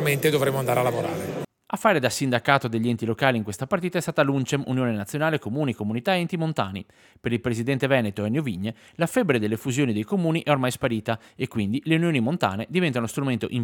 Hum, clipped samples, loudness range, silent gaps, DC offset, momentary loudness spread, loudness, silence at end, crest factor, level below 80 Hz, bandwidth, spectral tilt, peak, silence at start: none; under 0.1%; 3 LU; none; under 0.1%; 7 LU; -24 LUFS; 0 s; 22 dB; -62 dBFS; 19 kHz; -5.5 dB/octave; -2 dBFS; 0 s